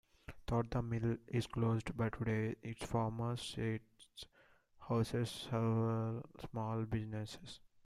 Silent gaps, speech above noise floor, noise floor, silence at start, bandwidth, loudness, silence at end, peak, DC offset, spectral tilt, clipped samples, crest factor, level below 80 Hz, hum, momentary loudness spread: none; 31 dB; -69 dBFS; 0.3 s; 12.5 kHz; -39 LUFS; 0.3 s; -24 dBFS; under 0.1%; -7 dB/octave; under 0.1%; 16 dB; -60 dBFS; none; 16 LU